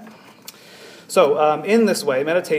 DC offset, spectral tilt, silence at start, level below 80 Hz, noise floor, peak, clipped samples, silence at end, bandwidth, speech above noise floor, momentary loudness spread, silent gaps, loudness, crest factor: under 0.1%; -4.5 dB/octave; 0 s; -78 dBFS; -43 dBFS; -2 dBFS; under 0.1%; 0 s; 15.5 kHz; 26 dB; 5 LU; none; -18 LUFS; 18 dB